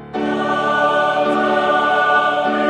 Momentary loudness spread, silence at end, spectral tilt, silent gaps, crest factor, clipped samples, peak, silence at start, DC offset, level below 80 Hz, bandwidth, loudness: 4 LU; 0 s; -5 dB/octave; none; 14 dB; under 0.1%; -4 dBFS; 0 s; under 0.1%; -56 dBFS; 9.8 kHz; -16 LUFS